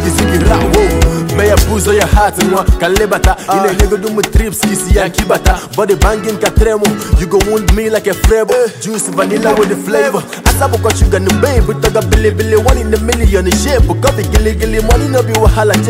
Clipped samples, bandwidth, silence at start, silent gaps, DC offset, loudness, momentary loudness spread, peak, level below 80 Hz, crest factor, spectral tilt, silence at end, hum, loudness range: under 0.1%; 16.5 kHz; 0 s; none; under 0.1%; -11 LUFS; 4 LU; 0 dBFS; -16 dBFS; 10 dB; -5 dB/octave; 0 s; none; 1 LU